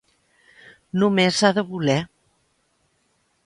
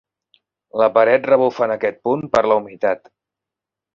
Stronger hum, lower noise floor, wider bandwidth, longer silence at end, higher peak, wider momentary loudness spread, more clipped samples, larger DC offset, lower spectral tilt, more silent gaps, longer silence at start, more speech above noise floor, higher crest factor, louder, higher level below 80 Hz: neither; second, -67 dBFS vs -86 dBFS; first, 11.5 kHz vs 7.2 kHz; first, 1.4 s vs 1 s; about the same, -2 dBFS vs 0 dBFS; about the same, 10 LU vs 8 LU; neither; neither; second, -5 dB/octave vs -6.5 dB/octave; neither; first, 0.95 s vs 0.75 s; second, 48 dB vs 69 dB; about the same, 22 dB vs 18 dB; second, -20 LUFS vs -17 LUFS; about the same, -62 dBFS vs -58 dBFS